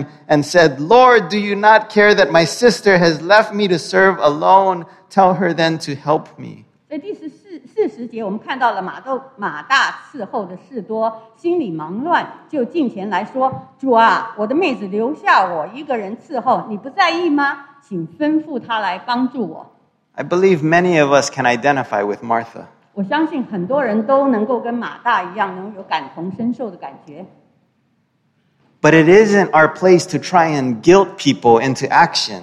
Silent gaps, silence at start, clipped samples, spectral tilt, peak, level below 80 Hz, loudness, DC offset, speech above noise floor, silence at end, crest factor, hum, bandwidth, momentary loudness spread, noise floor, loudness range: none; 0 s; under 0.1%; -5 dB/octave; 0 dBFS; -58 dBFS; -15 LUFS; under 0.1%; 47 dB; 0 s; 16 dB; none; 12.5 kHz; 15 LU; -63 dBFS; 9 LU